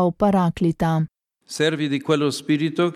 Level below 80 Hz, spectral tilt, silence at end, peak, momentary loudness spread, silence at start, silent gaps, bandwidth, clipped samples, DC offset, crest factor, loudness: -50 dBFS; -6 dB/octave; 0 s; -6 dBFS; 6 LU; 0 s; none; 14 kHz; under 0.1%; under 0.1%; 14 dB; -21 LUFS